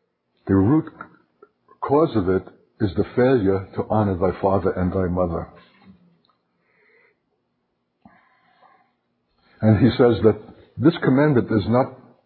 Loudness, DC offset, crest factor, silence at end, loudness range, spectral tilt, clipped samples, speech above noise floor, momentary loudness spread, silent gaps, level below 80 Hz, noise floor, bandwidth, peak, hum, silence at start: -20 LUFS; under 0.1%; 18 dB; 0.3 s; 9 LU; -12.5 dB/octave; under 0.1%; 54 dB; 11 LU; none; -42 dBFS; -73 dBFS; 4.6 kHz; -2 dBFS; none; 0.45 s